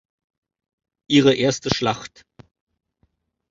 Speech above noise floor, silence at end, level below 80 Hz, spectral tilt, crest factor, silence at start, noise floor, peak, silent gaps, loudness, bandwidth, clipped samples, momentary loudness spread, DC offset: 49 dB; 1.45 s; -54 dBFS; -5 dB/octave; 24 dB; 1.1 s; -68 dBFS; 0 dBFS; none; -19 LUFS; 7.8 kHz; under 0.1%; 14 LU; under 0.1%